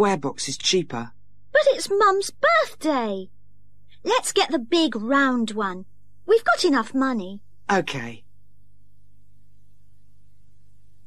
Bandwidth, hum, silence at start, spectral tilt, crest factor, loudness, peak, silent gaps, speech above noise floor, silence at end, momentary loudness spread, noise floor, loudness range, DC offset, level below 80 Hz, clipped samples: 14 kHz; 50 Hz at -60 dBFS; 0 s; -3.5 dB/octave; 16 dB; -22 LUFS; -8 dBFS; none; 38 dB; 2.9 s; 15 LU; -60 dBFS; 9 LU; 1%; -62 dBFS; under 0.1%